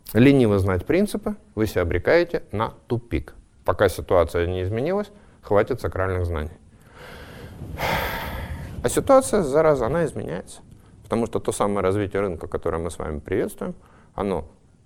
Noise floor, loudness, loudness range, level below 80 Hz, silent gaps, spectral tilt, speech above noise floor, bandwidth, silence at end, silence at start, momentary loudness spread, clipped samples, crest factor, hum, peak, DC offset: -45 dBFS; -23 LUFS; 5 LU; -40 dBFS; none; -6 dB/octave; 23 dB; 16.5 kHz; 0.4 s; 0.05 s; 16 LU; under 0.1%; 18 dB; none; -4 dBFS; under 0.1%